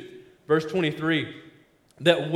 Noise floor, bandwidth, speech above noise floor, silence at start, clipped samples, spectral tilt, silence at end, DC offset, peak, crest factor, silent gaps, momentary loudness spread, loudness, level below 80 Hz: -58 dBFS; 14 kHz; 34 dB; 0 s; under 0.1%; -6 dB/octave; 0 s; under 0.1%; -4 dBFS; 22 dB; none; 19 LU; -25 LUFS; -66 dBFS